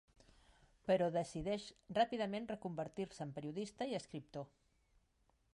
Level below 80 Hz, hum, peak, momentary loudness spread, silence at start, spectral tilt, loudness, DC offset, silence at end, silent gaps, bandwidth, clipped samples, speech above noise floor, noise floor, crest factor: -68 dBFS; none; -24 dBFS; 13 LU; 0.85 s; -6 dB/octave; -42 LUFS; under 0.1%; 1.1 s; none; 11.5 kHz; under 0.1%; 37 dB; -78 dBFS; 20 dB